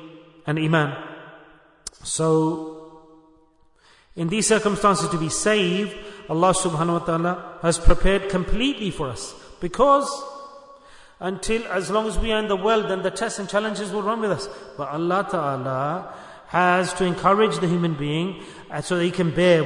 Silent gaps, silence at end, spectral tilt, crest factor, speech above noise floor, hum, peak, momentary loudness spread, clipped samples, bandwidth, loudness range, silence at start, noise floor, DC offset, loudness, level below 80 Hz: none; 0 s; -4.5 dB/octave; 20 dB; 36 dB; none; -4 dBFS; 15 LU; under 0.1%; 11 kHz; 4 LU; 0 s; -57 dBFS; under 0.1%; -22 LUFS; -34 dBFS